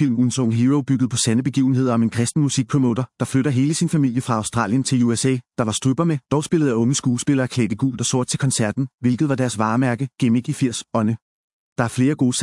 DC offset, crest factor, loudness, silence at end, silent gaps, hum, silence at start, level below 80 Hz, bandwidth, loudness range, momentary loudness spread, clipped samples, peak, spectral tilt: under 0.1%; 16 dB; -20 LUFS; 0 s; 8.94-8.98 s, 11.22-11.76 s; none; 0 s; -58 dBFS; 12 kHz; 2 LU; 4 LU; under 0.1%; -2 dBFS; -5.5 dB/octave